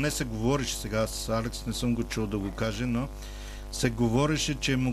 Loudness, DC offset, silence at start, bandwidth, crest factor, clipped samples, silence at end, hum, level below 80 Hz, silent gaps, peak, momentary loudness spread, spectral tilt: -29 LUFS; under 0.1%; 0 s; 15.5 kHz; 16 dB; under 0.1%; 0 s; 50 Hz at -40 dBFS; -40 dBFS; none; -12 dBFS; 9 LU; -5 dB/octave